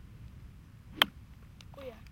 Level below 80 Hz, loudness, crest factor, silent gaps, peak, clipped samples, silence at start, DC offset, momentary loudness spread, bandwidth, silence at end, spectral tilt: -56 dBFS; -30 LUFS; 36 dB; none; -2 dBFS; under 0.1%; 0 s; under 0.1%; 25 LU; 16.5 kHz; 0 s; -2.5 dB/octave